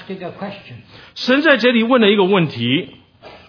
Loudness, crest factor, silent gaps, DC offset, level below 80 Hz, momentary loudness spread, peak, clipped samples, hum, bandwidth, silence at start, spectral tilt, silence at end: -14 LUFS; 16 dB; none; under 0.1%; -62 dBFS; 20 LU; 0 dBFS; under 0.1%; none; 5.4 kHz; 0 s; -6.5 dB/octave; 0.2 s